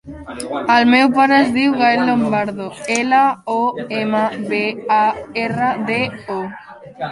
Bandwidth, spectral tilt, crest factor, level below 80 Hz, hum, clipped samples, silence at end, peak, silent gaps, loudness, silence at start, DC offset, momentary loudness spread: 11.5 kHz; -4.5 dB/octave; 16 dB; -52 dBFS; none; under 0.1%; 0 s; -2 dBFS; none; -16 LUFS; 0.05 s; under 0.1%; 14 LU